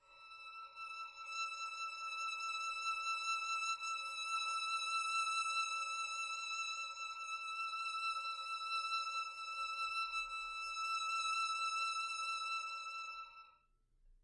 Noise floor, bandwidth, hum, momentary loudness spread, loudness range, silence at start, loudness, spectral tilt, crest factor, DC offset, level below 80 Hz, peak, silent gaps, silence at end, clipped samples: -74 dBFS; 11.5 kHz; none; 10 LU; 3 LU; 0.1 s; -40 LUFS; 4.5 dB/octave; 14 dB; under 0.1%; -78 dBFS; -28 dBFS; none; 0.1 s; under 0.1%